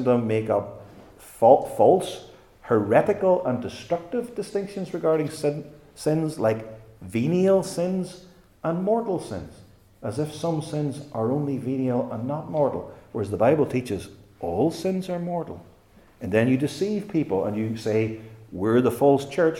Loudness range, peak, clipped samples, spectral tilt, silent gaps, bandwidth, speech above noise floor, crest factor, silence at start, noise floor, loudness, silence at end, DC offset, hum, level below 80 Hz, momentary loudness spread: 6 LU; -2 dBFS; under 0.1%; -7 dB/octave; none; 17.5 kHz; 31 dB; 22 dB; 0 s; -54 dBFS; -24 LUFS; 0 s; under 0.1%; none; -60 dBFS; 15 LU